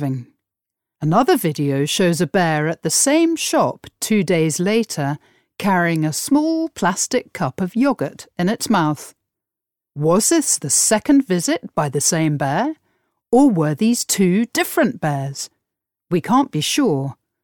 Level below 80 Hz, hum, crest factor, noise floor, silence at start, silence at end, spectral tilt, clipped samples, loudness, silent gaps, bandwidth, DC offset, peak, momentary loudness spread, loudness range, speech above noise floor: -58 dBFS; none; 16 dB; -86 dBFS; 0 s; 0.3 s; -4.5 dB/octave; under 0.1%; -18 LUFS; none; 19 kHz; under 0.1%; -4 dBFS; 10 LU; 3 LU; 68 dB